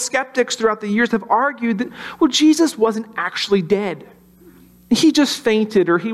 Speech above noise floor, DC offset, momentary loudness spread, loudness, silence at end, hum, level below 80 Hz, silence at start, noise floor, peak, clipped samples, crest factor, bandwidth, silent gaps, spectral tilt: 29 dB; under 0.1%; 9 LU; -17 LUFS; 0 s; none; -56 dBFS; 0 s; -47 dBFS; -4 dBFS; under 0.1%; 14 dB; 14.5 kHz; none; -4 dB/octave